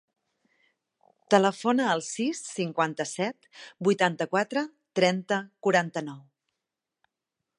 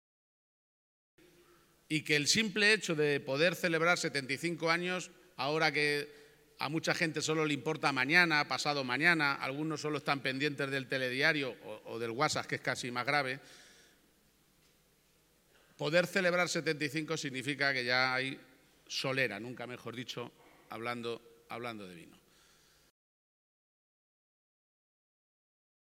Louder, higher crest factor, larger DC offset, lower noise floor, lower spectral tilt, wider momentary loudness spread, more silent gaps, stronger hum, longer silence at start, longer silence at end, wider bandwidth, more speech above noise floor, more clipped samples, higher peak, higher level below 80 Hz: first, -27 LUFS vs -32 LUFS; about the same, 24 dB vs 26 dB; neither; first, -87 dBFS vs -70 dBFS; about the same, -4.5 dB/octave vs -3.5 dB/octave; second, 9 LU vs 16 LU; neither; neither; second, 1.3 s vs 1.9 s; second, 1.4 s vs 3.95 s; second, 11 kHz vs 16.5 kHz; first, 60 dB vs 36 dB; neither; first, -6 dBFS vs -10 dBFS; about the same, -80 dBFS vs -78 dBFS